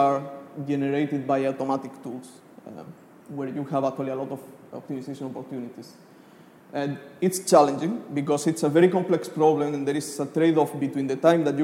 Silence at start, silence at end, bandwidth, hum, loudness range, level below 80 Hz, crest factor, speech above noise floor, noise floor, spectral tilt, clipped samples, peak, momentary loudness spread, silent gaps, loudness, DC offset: 0 s; 0 s; 16.5 kHz; none; 10 LU; -76 dBFS; 20 dB; 26 dB; -51 dBFS; -6 dB/octave; under 0.1%; -4 dBFS; 19 LU; none; -25 LUFS; under 0.1%